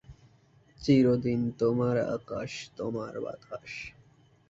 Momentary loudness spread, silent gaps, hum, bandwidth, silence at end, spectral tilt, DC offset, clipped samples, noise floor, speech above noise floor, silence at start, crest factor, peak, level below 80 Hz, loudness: 17 LU; none; none; 7.8 kHz; 0.6 s; -7.5 dB/octave; under 0.1%; under 0.1%; -61 dBFS; 33 dB; 0.1 s; 18 dB; -12 dBFS; -60 dBFS; -29 LUFS